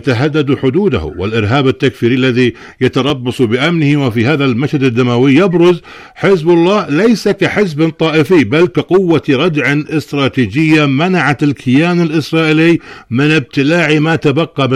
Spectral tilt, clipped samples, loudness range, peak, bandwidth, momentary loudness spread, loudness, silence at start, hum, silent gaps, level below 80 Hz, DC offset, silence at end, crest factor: -7 dB/octave; under 0.1%; 2 LU; -2 dBFS; 13.5 kHz; 5 LU; -11 LUFS; 0.05 s; none; none; -42 dBFS; under 0.1%; 0 s; 10 dB